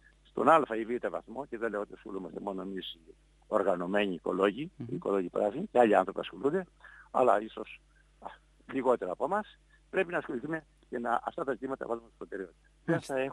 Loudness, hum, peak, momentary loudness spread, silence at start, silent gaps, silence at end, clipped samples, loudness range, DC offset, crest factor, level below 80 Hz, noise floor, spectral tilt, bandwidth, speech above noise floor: -32 LUFS; none; -8 dBFS; 17 LU; 0.35 s; none; 0 s; under 0.1%; 6 LU; under 0.1%; 24 dB; -64 dBFS; -50 dBFS; -6.5 dB/octave; 11.5 kHz; 18 dB